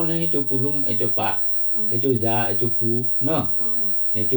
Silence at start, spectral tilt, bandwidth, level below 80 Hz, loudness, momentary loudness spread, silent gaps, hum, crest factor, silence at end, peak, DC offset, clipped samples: 0 s; -8 dB/octave; over 20 kHz; -58 dBFS; -18 LUFS; 1 LU; none; none; 12 dB; 0 s; -8 dBFS; under 0.1%; under 0.1%